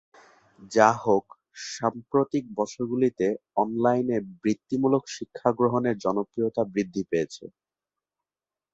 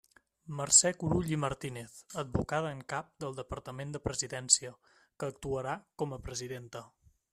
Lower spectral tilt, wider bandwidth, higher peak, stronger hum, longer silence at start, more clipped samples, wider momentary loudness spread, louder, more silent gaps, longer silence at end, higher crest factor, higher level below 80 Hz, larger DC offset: first, -6 dB/octave vs -3 dB/octave; second, 8 kHz vs 14.5 kHz; first, -4 dBFS vs -8 dBFS; neither; first, 0.6 s vs 0.45 s; neither; second, 8 LU vs 19 LU; first, -26 LUFS vs -32 LUFS; neither; first, 1.25 s vs 0.45 s; about the same, 24 dB vs 28 dB; second, -66 dBFS vs -56 dBFS; neither